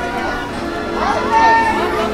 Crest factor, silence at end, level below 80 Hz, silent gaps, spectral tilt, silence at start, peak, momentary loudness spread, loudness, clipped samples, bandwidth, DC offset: 16 dB; 0 s; -34 dBFS; none; -4.5 dB/octave; 0 s; 0 dBFS; 11 LU; -16 LUFS; under 0.1%; 15.5 kHz; under 0.1%